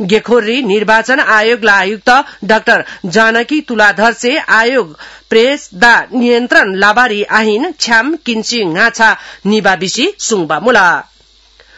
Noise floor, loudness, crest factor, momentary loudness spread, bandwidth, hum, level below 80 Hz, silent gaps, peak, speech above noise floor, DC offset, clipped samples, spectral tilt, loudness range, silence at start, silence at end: -46 dBFS; -10 LUFS; 10 dB; 6 LU; 12 kHz; none; -48 dBFS; none; 0 dBFS; 35 dB; 0.4%; 0.7%; -3 dB/octave; 2 LU; 0 s; 0.75 s